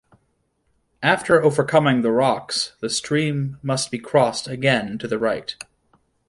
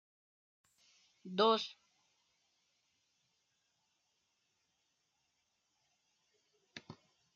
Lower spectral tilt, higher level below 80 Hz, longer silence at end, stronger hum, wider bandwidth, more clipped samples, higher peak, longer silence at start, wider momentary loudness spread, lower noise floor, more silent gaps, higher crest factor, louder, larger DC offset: first, -4.5 dB/octave vs -2 dB/octave; first, -58 dBFS vs under -90 dBFS; first, 0.75 s vs 0.4 s; neither; first, 11.5 kHz vs 7.4 kHz; neither; first, -2 dBFS vs -18 dBFS; second, 1 s vs 1.25 s; second, 9 LU vs 24 LU; second, -68 dBFS vs -82 dBFS; neither; second, 18 dB vs 26 dB; first, -20 LUFS vs -34 LUFS; neither